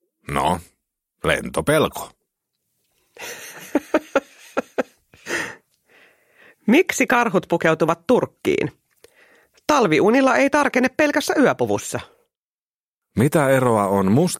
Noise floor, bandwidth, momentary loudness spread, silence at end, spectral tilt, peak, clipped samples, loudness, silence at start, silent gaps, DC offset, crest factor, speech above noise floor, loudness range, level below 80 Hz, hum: under -90 dBFS; 16.5 kHz; 15 LU; 0 s; -5 dB/octave; -2 dBFS; under 0.1%; -20 LUFS; 0.3 s; 12.39-13.02 s; under 0.1%; 20 dB; over 72 dB; 8 LU; -52 dBFS; none